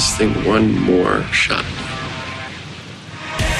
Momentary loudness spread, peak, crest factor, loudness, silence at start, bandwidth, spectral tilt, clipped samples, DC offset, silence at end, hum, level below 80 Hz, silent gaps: 16 LU; -4 dBFS; 16 dB; -17 LUFS; 0 s; 13.5 kHz; -4 dB/octave; under 0.1%; under 0.1%; 0 s; none; -34 dBFS; none